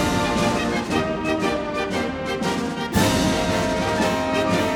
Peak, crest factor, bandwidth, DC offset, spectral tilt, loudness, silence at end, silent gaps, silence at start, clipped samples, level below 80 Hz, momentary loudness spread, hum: -6 dBFS; 16 dB; 19.5 kHz; under 0.1%; -4.5 dB/octave; -22 LUFS; 0 s; none; 0 s; under 0.1%; -40 dBFS; 5 LU; none